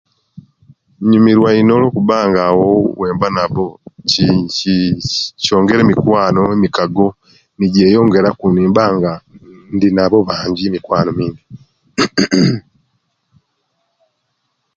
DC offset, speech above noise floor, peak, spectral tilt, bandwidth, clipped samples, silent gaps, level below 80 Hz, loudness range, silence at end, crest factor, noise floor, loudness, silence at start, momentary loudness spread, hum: under 0.1%; 56 dB; 0 dBFS; -6 dB/octave; 7.8 kHz; under 0.1%; none; -44 dBFS; 5 LU; 2.15 s; 14 dB; -68 dBFS; -13 LUFS; 0.35 s; 9 LU; none